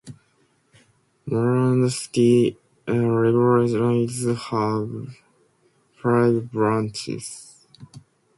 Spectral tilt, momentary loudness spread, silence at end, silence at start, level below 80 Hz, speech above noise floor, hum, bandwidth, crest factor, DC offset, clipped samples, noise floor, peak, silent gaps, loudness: -7 dB/octave; 15 LU; 0.4 s; 0.05 s; -60 dBFS; 43 dB; none; 11.5 kHz; 16 dB; under 0.1%; under 0.1%; -64 dBFS; -6 dBFS; none; -21 LUFS